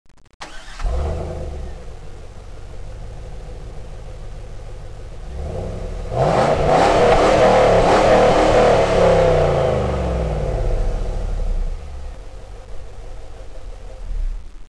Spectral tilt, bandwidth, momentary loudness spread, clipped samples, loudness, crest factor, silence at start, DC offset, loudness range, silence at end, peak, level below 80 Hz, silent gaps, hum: -6 dB/octave; 11 kHz; 26 LU; under 0.1%; -17 LUFS; 12 dB; 0.4 s; 0.8%; 21 LU; 0 s; -6 dBFS; -26 dBFS; none; none